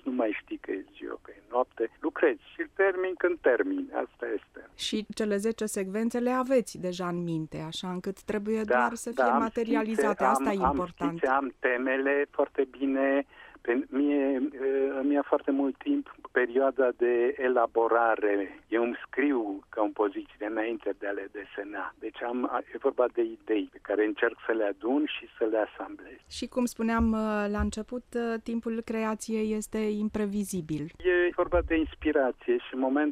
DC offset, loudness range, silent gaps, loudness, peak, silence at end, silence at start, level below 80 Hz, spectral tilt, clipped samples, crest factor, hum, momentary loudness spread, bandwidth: under 0.1%; 4 LU; none; -29 LUFS; -10 dBFS; 0 s; 0.05 s; -50 dBFS; -5.5 dB/octave; under 0.1%; 18 dB; none; 10 LU; 15 kHz